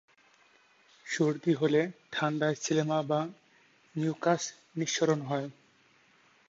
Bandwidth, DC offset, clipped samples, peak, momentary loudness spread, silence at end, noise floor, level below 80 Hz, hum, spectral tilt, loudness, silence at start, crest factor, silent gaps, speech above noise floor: 8 kHz; under 0.1%; under 0.1%; -12 dBFS; 10 LU; 0.95 s; -64 dBFS; -78 dBFS; none; -5 dB/octave; -30 LUFS; 1.05 s; 20 dB; none; 35 dB